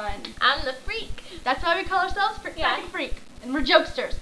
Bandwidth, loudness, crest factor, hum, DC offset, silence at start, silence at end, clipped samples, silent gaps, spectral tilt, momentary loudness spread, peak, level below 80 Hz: 11 kHz; -24 LUFS; 24 dB; none; 0.3%; 0 s; 0 s; under 0.1%; none; -3.5 dB/octave; 12 LU; -2 dBFS; -38 dBFS